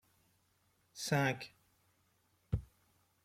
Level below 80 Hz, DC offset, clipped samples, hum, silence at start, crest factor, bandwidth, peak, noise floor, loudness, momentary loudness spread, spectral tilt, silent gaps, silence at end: -56 dBFS; under 0.1%; under 0.1%; none; 0.95 s; 24 dB; 16 kHz; -18 dBFS; -76 dBFS; -38 LUFS; 17 LU; -5 dB/octave; none; 0.6 s